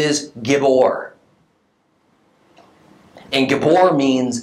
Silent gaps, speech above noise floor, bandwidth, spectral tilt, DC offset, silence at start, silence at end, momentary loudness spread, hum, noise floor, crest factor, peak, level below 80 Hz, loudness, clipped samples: none; 47 dB; 13 kHz; -4.5 dB/octave; under 0.1%; 0 s; 0 s; 8 LU; none; -62 dBFS; 18 dB; 0 dBFS; -64 dBFS; -16 LUFS; under 0.1%